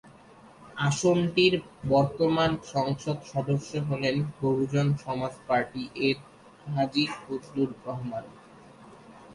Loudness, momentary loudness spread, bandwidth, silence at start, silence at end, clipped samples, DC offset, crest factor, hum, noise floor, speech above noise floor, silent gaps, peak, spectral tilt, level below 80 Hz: -28 LUFS; 11 LU; 11.5 kHz; 0.05 s; 0 s; under 0.1%; under 0.1%; 18 dB; none; -52 dBFS; 25 dB; none; -10 dBFS; -6 dB/octave; -58 dBFS